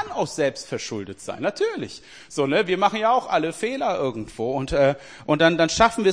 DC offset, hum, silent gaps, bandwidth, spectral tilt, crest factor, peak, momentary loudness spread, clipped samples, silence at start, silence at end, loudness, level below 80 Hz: 0.2%; none; none; 10.5 kHz; -4.5 dB/octave; 20 dB; -2 dBFS; 14 LU; under 0.1%; 0 s; 0 s; -23 LUFS; -48 dBFS